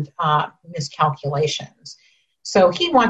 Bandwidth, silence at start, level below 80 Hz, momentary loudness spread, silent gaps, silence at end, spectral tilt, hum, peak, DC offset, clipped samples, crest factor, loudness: 8.6 kHz; 0 s; -58 dBFS; 21 LU; none; 0 s; -5 dB/octave; none; -4 dBFS; under 0.1%; under 0.1%; 16 dB; -20 LUFS